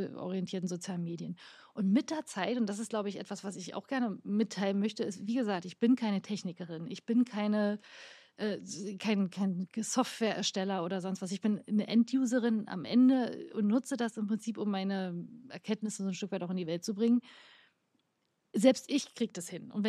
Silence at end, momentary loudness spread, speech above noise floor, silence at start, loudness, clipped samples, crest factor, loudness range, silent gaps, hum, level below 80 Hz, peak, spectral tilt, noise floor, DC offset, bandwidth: 0 s; 12 LU; 47 dB; 0 s; -33 LUFS; under 0.1%; 22 dB; 5 LU; none; none; -88 dBFS; -12 dBFS; -5.5 dB/octave; -79 dBFS; under 0.1%; 13.5 kHz